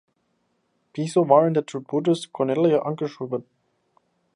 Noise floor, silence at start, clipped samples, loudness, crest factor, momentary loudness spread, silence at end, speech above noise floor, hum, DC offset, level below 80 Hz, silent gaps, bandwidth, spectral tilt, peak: -71 dBFS; 0.95 s; under 0.1%; -22 LUFS; 22 dB; 13 LU; 0.95 s; 49 dB; none; under 0.1%; -76 dBFS; none; 11 kHz; -7 dB/octave; -2 dBFS